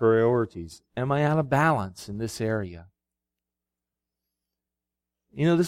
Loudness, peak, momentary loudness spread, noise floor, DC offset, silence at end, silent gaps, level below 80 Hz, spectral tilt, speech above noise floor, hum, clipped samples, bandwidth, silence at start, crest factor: -26 LUFS; -10 dBFS; 16 LU; -88 dBFS; under 0.1%; 0 s; none; -58 dBFS; -7 dB/octave; 62 dB; none; under 0.1%; 15.5 kHz; 0 s; 16 dB